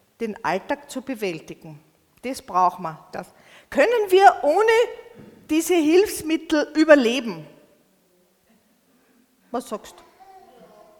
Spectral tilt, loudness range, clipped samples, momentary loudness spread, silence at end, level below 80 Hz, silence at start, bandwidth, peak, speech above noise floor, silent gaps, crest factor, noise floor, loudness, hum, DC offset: -4 dB/octave; 15 LU; under 0.1%; 21 LU; 1.1 s; -60 dBFS; 0.2 s; 19 kHz; 0 dBFS; 41 dB; none; 22 dB; -62 dBFS; -20 LUFS; none; under 0.1%